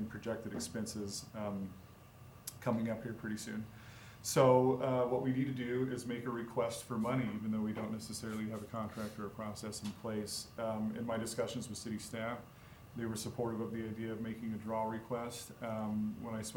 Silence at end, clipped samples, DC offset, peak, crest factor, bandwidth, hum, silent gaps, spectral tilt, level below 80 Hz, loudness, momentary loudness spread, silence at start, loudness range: 0 s; under 0.1%; under 0.1%; -14 dBFS; 24 dB; over 20 kHz; none; none; -5.5 dB/octave; -68 dBFS; -38 LUFS; 11 LU; 0 s; 7 LU